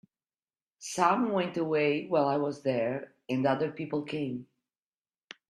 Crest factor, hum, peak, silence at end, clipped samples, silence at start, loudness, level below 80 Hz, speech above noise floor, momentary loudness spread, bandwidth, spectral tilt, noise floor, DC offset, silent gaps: 20 dB; none; -10 dBFS; 1.05 s; under 0.1%; 0.8 s; -30 LUFS; -74 dBFS; over 61 dB; 10 LU; 13 kHz; -5.5 dB/octave; under -90 dBFS; under 0.1%; none